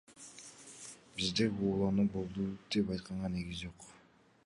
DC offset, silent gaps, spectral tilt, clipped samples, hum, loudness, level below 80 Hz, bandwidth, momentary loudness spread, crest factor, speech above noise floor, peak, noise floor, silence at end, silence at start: under 0.1%; none; -5.5 dB/octave; under 0.1%; none; -35 LUFS; -58 dBFS; 11.5 kHz; 19 LU; 18 dB; 30 dB; -20 dBFS; -65 dBFS; 0.5 s; 0.1 s